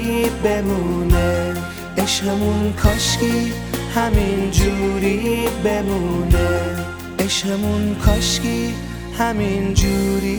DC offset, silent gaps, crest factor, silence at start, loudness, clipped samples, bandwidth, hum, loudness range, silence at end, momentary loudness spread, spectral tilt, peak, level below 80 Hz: under 0.1%; none; 18 dB; 0 s; -19 LUFS; under 0.1%; over 20 kHz; none; 1 LU; 0 s; 6 LU; -5 dB/octave; 0 dBFS; -26 dBFS